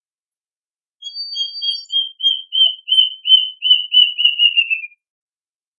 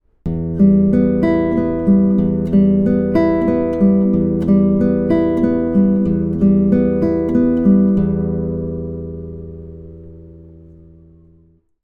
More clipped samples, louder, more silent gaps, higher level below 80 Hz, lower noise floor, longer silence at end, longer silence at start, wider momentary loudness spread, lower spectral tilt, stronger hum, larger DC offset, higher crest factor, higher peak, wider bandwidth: neither; about the same, -13 LUFS vs -15 LUFS; neither; second, under -90 dBFS vs -38 dBFS; first, under -90 dBFS vs -52 dBFS; second, 0.95 s vs 1.35 s; first, 1 s vs 0.25 s; about the same, 14 LU vs 13 LU; second, 11.5 dB/octave vs -11.5 dB/octave; neither; neither; about the same, 18 dB vs 14 dB; about the same, 0 dBFS vs -2 dBFS; first, 9.8 kHz vs 4.9 kHz